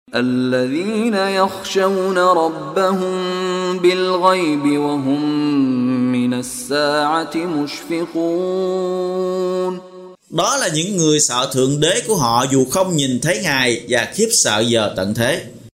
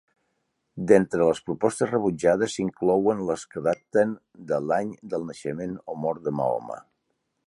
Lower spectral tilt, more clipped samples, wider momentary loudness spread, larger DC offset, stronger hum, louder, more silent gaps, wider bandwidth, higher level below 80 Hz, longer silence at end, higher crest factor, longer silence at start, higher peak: second, -3.5 dB/octave vs -6 dB/octave; neither; second, 6 LU vs 12 LU; neither; neither; first, -17 LUFS vs -25 LUFS; neither; first, 16 kHz vs 11.5 kHz; first, -54 dBFS vs -60 dBFS; second, 0.05 s vs 0.7 s; about the same, 18 dB vs 22 dB; second, 0.1 s vs 0.75 s; first, 0 dBFS vs -4 dBFS